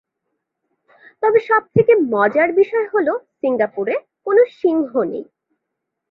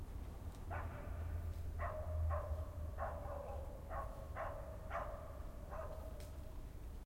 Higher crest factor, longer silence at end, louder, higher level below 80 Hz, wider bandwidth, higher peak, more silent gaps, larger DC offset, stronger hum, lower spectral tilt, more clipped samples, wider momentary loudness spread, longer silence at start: about the same, 16 dB vs 16 dB; first, 0.9 s vs 0 s; first, -17 LUFS vs -47 LUFS; second, -62 dBFS vs -50 dBFS; second, 5.2 kHz vs 16 kHz; first, -2 dBFS vs -30 dBFS; neither; neither; neither; first, -9.5 dB/octave vs -7 dB/octave; neither; about the same, 8 LU vs 9 LU; first, 1.2 s vs 0 s